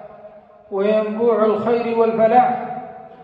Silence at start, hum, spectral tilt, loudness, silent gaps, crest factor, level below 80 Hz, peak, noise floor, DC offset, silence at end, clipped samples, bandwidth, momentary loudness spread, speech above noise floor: 0 s; none; -8.5 dB/octave; -18 LUFS; none; 16 dB; -66 dBFS; -2 dBFS; -43 dBFS; under 0.1%; 0 s; under 0.1%; 5 kHz; 15 LU; 26 dB